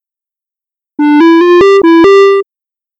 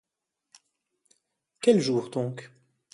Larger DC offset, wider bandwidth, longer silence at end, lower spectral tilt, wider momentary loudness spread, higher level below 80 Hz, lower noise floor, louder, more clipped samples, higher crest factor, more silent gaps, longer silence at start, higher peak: neither; second, 8 kHz vs 11.5 kHz; about the same, 0.55 s vs 0.5 s; about the same, -5 dB/octave vs -6 dB/octave; about the same, 12 LU vs 12 LU; first, -46 dBFS vs -74 dBFS; about the same, -87 dBFS vs -84 dBFS; first, -5 LUFS vs -26 LUFS; neither; second, 6 dB vs 22 dB; neither; second, 1 s vs 1.6 s; first, -2 dBFS vs -8 dBFS